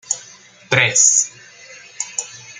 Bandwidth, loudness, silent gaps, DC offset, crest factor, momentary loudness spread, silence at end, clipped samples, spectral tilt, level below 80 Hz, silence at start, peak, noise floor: 10.5 kHz; -15 LUFS; none; under 0.1%; 20 dB; 15 LU; 0.05 s; under 0.1%; -0.5 dB/octave; -62 dBFS; 0.1 s; 0 dBFS; -44 dBFS